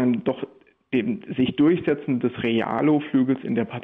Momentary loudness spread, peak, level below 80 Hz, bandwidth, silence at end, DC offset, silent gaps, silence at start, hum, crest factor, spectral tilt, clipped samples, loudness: 8 LU; -10 dBFS; -60 dBFS; 3.9 kHz; 0 s; under 0.1%; none; 0 s; none; 12 dB; -9.5 dB/octave; under 0.1%; -23 LUFS